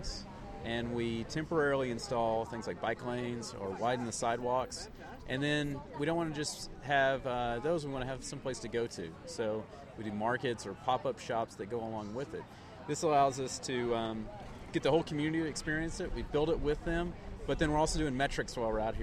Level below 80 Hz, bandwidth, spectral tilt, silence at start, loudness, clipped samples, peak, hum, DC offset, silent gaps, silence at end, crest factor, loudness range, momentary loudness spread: -48 dBFS; 16 kHz; -5 dB/octave; 0 s; -35 LUFS; under 0.1%; -16 dBFS; none; under 0.1%; none; 0 s; 18 dB; 3 LU; 12 LU